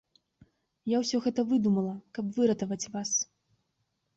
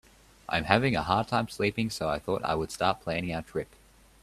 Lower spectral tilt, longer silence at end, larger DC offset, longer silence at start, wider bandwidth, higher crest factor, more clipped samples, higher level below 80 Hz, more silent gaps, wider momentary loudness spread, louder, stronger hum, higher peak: about the same, -4.5 dB/octave vs -5.5 dB/octave; first, 0.9 s vs 0.6 s; neither; first, 0.85 s vs 0.5 s; second, 8.2 kHz vs 14.5 kHz; second, 16 dB vs 28 dB; neither; second, -70 dBFS vs -52 dBFS; neither; about the same, 9 LU vs 11 LU; about the same, -29 LUFS vs -29 LUFS; neither; second, -14 dBFS vs -2 dBFS